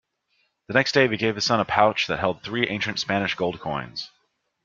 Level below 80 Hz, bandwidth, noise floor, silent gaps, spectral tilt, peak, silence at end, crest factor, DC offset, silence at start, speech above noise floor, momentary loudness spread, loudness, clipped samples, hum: -58 dBFS; 7.6 kHz; -70 dBFS; none; -4.5 dB/octave; -2 dBFS; 0.6 s; 22 dB; under 0.1%; 0.7 s; 47 dB; 10 LU; -23 LUFS; under 0.1%; none